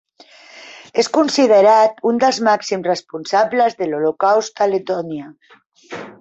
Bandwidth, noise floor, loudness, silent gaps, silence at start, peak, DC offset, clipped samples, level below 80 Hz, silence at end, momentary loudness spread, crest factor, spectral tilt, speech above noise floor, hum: 8.2 kHz; -45 dBFS; -16 LUFS; 5.66-5.70 s; 0.55 s; -2 dBFS; under 0.1%; under 0.1%; -66 dBFS; 0.1 s; 19 LU; 14 dB; -4 dB/octave; 29 dB; none